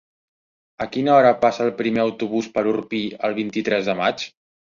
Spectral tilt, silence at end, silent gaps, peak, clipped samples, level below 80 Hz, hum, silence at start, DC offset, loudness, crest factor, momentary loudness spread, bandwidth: -5.5 dB/octave; 0.4 s; none; -2 dBFS; under 0.1%; -62 dBFS; none; 0.8 s; under 0.1%; -20 LUFS; 18 dB; 12 LU; 7.4 kHz